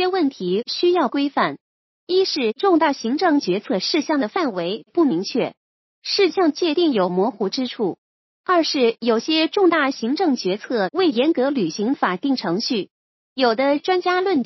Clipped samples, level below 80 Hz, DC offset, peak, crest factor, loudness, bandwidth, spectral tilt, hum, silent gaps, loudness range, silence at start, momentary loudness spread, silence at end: under 0.1%; -76 dBFS; under 0.1%; -4 dBFS; 16 dB; -20 LUFS; 6.2 kHz; -5 dB/octave; none; 1.61-2.07 s, 5.57-6.02 s, 7.98-8.44 s, 12.91-13.36 s; 2 LU; 0 s; 7 LU; 0 s